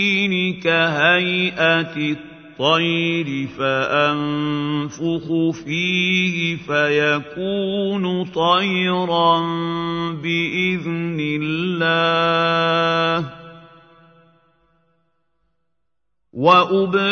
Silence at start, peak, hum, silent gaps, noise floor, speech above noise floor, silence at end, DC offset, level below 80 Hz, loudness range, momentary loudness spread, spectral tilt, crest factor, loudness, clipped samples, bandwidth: 0 s; 0 dBFS; none; none; -79 dBFS; 60 dB; 0 s; under 0.1%; -58 dBFS; 4 LU; 8 LU; -5.5 dB/octave; 20 dB; -18 LUFS; under 0.1%; 6.6 kHz